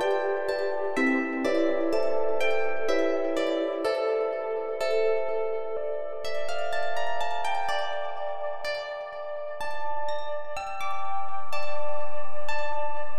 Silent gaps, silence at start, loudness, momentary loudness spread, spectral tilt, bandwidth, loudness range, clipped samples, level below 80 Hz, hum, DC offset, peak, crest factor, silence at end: none; 0 s; -29 LUFS; 8 LU; -5 dB/octave; 15 kHz; 7 LU; under 0.1%; -62 dBFS; none; under 0.1%; -12 dBFS; 10 dB; 0 s